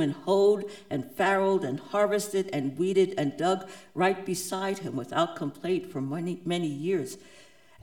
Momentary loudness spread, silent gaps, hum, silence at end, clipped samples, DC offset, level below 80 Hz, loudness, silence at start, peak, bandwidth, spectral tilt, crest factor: 9 LU; none; none; 0.4 s; under 0.1%; 0.1%; -72 dBFS; -28 LUFS; 0 s; -10 dBFS; 18.5 kHz; -5.5 dB/octave; 18 dB